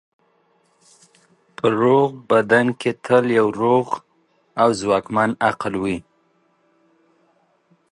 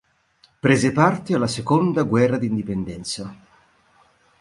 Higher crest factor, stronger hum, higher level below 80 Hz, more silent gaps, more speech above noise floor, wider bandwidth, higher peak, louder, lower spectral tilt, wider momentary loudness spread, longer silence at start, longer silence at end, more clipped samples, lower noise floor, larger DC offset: about the same, 18 dB vs 20 dB; neither; second, -58 dBFS vs -52 dBFS; neither; first, 44 dB vs 39 dB; about the same, 11.5 kHz vs 11.5 kHz; about the same, -2 dBFS vs -2 dBFS; about the same, -19 LUFS vs -21 LUFS; about the same, -6 dB/octave vs -6 dB/octave; about the same, 10 LU vs 11 LU; first, 1.65 s vs 0.65 s; first, 1.9 s vs 1.05 s; neither; about the same, -62 dBFS vs -59 dBFS; neither